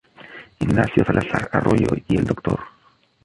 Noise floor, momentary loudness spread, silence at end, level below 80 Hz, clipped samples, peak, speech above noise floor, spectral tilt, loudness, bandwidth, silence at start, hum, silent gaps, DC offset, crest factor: -58 dBFS; 16 LU; 0.55 s; -40 dBFS; under 0.1%; -2 dBFS; 38 dB; -8 dB/octave; -20 LUFS; 11.5 kHz; 0.2 s; none; none; under 0.1%; 18 dB